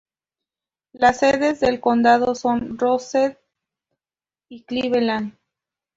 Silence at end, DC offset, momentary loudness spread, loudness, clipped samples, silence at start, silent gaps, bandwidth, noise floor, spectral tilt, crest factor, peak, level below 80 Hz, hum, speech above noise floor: 0.65 s; under 0.1%; 9 LU; -19 LUFS; under 0.1%; 0.95 s; none; 7.8 kHz; under -90 dBFS; -4.5 dB/octave; 18 dB; -2 dBFS; -54 dBFS; none; over 71 dB